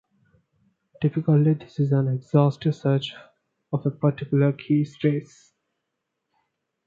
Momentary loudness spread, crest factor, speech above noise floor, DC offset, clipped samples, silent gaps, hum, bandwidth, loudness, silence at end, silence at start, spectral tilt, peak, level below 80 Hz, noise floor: 8 LU; 20 dB; 58 dB; under 0.1%; under 0.1%; none; none; 7.2 kHz; -23 LUFS; 1.65 s; 1 s; -9 dB/octave; -6 dBFS; -66 dBFS; -80 dBFS